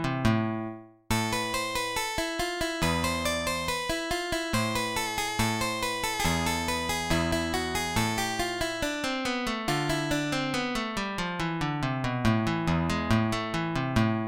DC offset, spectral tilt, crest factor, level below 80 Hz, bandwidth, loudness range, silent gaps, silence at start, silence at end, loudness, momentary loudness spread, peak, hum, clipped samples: 0.1%; -4 dB/octave; 18 dB; -44 dBFS; 17 kHz; 1 LU; none; 0 s; 0 s; -28 LUFS; 3 LU; -10 dBFS; none; under 0.1%